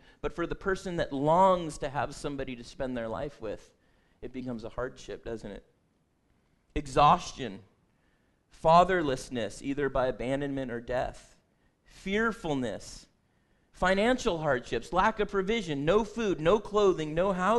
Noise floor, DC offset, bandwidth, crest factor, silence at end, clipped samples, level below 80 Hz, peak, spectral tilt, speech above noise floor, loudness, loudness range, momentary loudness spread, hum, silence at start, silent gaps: -71 dBFS; under 0.1%; 12 kHz; 22 dB; 0 s; under 0.1%; -48 dBFS; -8 dBFS; -5.5 dB/octave; 42 dB; -29 LUFS; 11 LU; 17 LU; none; 0.25 s; none